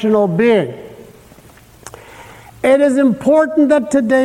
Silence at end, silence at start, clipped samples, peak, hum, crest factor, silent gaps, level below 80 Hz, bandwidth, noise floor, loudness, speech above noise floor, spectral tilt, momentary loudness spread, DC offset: 0 s; 0 s; under 0.1%; -2 dBFS; none; 12 dB; none; -52 dBFS; 16 kHz; -43 dBFS; -13 LUFS; 31 dB; -6.5 dB/octave; 11 LU; under 0.1%